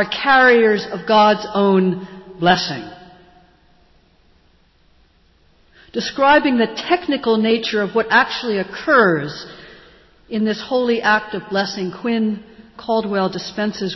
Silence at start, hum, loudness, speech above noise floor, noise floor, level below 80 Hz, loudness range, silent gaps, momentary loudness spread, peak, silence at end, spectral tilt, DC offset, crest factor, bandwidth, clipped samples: 0 s; none; -17 LUFS; 38 dB; -55 dBFS; -54 dBFS; 9 LU; none; 14 LU; -2 dBFS; 0 s; -5.5 dB/octave; under 0.1%; 16 dB; 6.2 kHz; under 0.1%